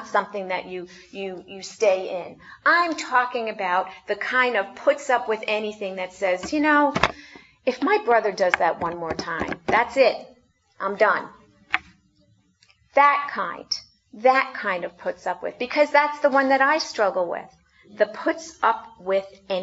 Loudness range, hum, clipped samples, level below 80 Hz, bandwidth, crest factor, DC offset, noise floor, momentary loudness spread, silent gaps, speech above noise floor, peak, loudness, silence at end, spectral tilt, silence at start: 2 LU; none; under 0.1%; -58 dBFS; 8 kHz; 24 dB; under 0.1%; -62 dBFS; 12 LU; none; 39 dB; 0 dBFS; -23 LUFS; 0 s; -3.5 dB/octave; 0 s